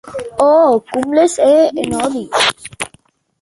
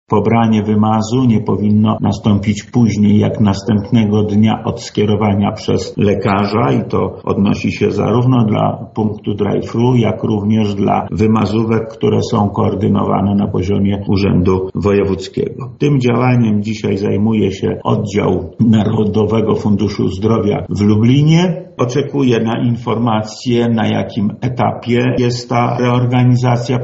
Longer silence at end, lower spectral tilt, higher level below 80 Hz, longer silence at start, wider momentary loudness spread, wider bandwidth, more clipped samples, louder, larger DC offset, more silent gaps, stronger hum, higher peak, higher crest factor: first, 0.55 s vs 0 s; second, -3 dB/octave vs -7 dB/octave; second, -50 dBFS vs -42 dBFS; about the same, 0.05 s vs 0.1 s; first, 15 LU vs 6 LU; first, 11.5 kHz vs 8 kHz; neither; about the same, -13 LUFS vs -14 LUFS; neither; neither; neither; about the same, 0 dBFS vs 0 dBFS; about the same, 14 dB vs 12 dB